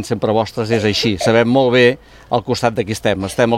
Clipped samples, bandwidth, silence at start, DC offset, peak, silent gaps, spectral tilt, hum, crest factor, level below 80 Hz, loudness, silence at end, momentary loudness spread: under 0.1%; 16 kHz; 0 s; under 0.1%; 0 dBFS; none; -5.5 dB/octave; none; 14 dB; -46 dBFS; -16 LUFS; 0 s; 7 LU